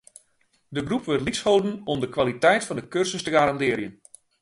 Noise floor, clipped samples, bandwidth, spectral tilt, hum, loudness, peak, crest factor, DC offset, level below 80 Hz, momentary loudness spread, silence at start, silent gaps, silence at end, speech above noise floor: -66 dBFS; under 0.1%; 11.5 kHz; -4.5 dB/octave; none; -24 LUFS; -6 dBFS; 18 dB; under 0.1%; -54 dBFS; 9 LU; 0.7 s; none; 0.5 s; 43 dB